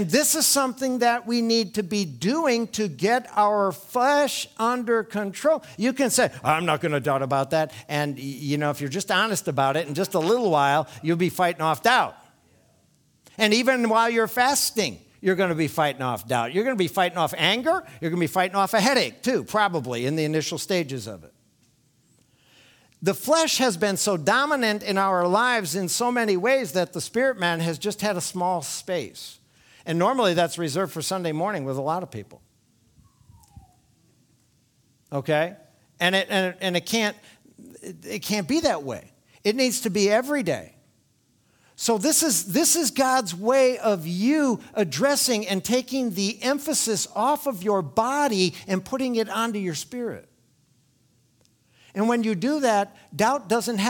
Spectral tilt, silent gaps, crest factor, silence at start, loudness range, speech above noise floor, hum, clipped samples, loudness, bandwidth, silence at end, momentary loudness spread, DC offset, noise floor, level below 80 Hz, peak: -3.5 dB/octave; none; 20 dB; 0 s; 6 LU; 41 dB; none; under 0.1%; -23 LUFS; 19.5 kHz; 0 s; 9 LU; under 0.1%; -65 dBFS; -66 dBFS; -4 dBFS